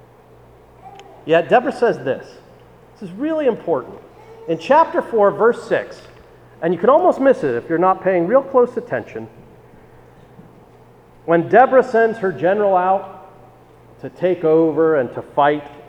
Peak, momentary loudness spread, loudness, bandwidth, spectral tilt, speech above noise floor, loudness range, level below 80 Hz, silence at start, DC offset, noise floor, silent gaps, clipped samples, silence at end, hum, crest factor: 0 dBFS; 20 LU; -17 LUFS; 9.4 kHz; -7.5 dB/octave; 30 dB; 4 LU; -56 dBFS; 0.85 s; under 0.1%; -46 dBFS; none; under 0.1%; 0.05 s; none; 18 dB